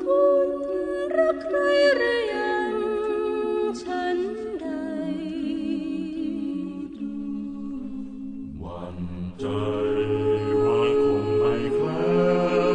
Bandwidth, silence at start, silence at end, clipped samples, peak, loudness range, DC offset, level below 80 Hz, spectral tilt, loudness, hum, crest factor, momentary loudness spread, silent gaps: 9.8 kHz; 0 s; 0 s; under 0.1%; -8 dBFS; 9 LU; under 0.1%; -52 dBFS; -7 dB/octave; -25 LUFS; none; 16 dB; 13 LU; none